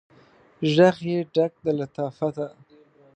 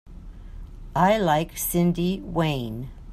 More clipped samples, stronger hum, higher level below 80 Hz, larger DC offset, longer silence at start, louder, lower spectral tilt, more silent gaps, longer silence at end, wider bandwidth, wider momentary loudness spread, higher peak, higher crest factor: neither; neither; second, -68 dBFS vs -40 dBFS; neither; first, 0.6 s vs 0.05 s; about the same, -23 LUFS vs -24 LUFS; first, -7 dB/octave vs -5.5 dB/octave; neither; first, 0.65 s vs 0 s; second, 8.8 kHz vs 15 kHz; second, 12 LU vs 23 LU; about the same, -4 dBFS vs -6 dBFS; about the same, 20 dB vs 18 dB